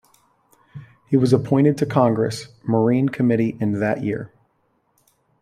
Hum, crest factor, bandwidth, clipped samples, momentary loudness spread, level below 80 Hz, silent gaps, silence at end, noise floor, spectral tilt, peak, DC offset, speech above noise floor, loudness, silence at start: none; 20 dB; 14 kHz; under 0.1%; 9 LU; -58 dBFS; none; 1.15 s; -66 dBFS; -8 dB/octave; -2 dBFS; under 0.1%; 47 dB; -20 LUFS; 0.75 s